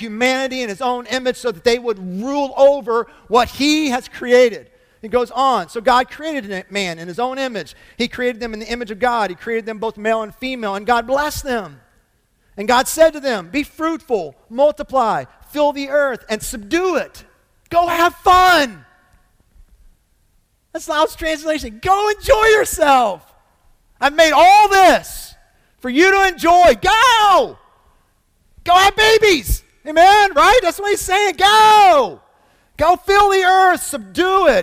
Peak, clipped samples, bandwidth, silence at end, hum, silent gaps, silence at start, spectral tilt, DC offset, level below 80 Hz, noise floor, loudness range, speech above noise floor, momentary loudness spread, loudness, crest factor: 0 dBFS; under 0.1%; 16.5 kHz; 0 s; none; none; 0 s; -3 dB/octave; under 0.1%; -38 dBFS; -60 dBFS; 9 LU; 45 dB; 14 LU; -15 LUFS; 14 dB